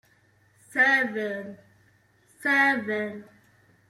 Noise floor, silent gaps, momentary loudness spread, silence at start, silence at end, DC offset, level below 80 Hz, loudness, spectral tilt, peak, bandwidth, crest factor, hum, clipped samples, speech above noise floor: -63 dBFS; none; 16 LU; 0.7 s; 0.65 s; under 0.1%; -76 dBFS; -24 LUFS; -4 dB/octave; -10 dBFS; 15.5 kHz; 18 dB; none; under 0.1%; 38 dB